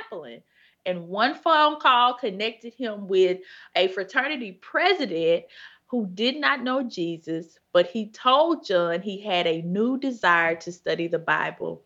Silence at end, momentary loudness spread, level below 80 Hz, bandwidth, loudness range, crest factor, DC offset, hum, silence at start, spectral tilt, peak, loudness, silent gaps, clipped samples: 0.1 s; 12 LU; -78 dBFS; 7.8 kHz; 3 LU; 20 dB; under 0.1%; none; 0 s; -5 dB/octave; -4 dBFS; -24 LUFS; none; under 0.1%